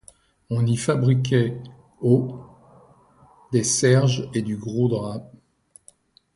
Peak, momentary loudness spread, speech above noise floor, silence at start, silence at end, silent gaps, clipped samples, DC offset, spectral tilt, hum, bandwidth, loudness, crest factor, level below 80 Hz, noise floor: -6 dBFS; 15 LU; 35 dB; 0.5 s; 1.1 s; none; under 0.1%; under 0.1%; -5.5 dB/octave; none; 11.5 kHz; -22 LUFS; 18 dB; -56 dBFS; -56 dBFS